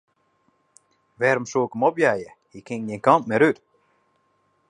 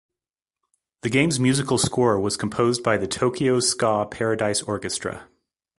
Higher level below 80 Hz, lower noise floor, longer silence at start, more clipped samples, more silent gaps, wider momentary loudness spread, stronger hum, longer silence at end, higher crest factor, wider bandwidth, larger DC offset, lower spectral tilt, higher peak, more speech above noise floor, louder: second, -68 dBFS vs -52 dBFS; second, -67 dBFS vs under -90 dBFS; first, 1.2 s vs 1.05 s; neither; neither; first, 14 LU vs 8 LU; neither; first, 1.15 s vs 0.55 s; about the same, 22 dB vs 20 dB; about the same, 11 kHz vs 11.5 kHz; neither; first, -6 dB/octave vs -4.5 dB/octave; about the same, -2 dBFS vs -4 dBFS; second, 46 dB vs over 68 dB; about the same, -22 LUFS vs -22 LUFS